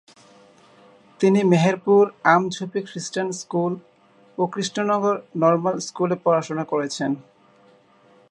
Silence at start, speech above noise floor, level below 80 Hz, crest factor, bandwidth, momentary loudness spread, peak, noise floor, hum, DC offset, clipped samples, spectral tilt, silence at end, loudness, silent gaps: 1.2 s; 34 dB; -72 dBFS; 20 dB; 11 kHz; 11 LU; -2 dBFS; -55 dBFS; none; under 0.1%; under 0.1%; -5.5 dB/octave; 1.1 s; -21 LUFS; none